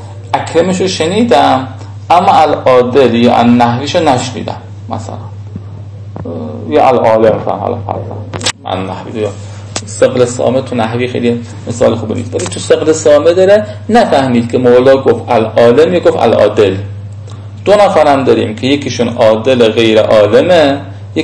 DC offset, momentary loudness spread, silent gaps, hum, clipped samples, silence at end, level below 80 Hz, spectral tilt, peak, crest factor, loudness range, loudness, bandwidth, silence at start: under 0.1%; 16 LU; none; none; 3%; 0 s; -46 dBFS; -5.5 dB/octave; 0 dBFS; 10 dB; 6 LU; -9 LUFS; 11 kHz; 0 s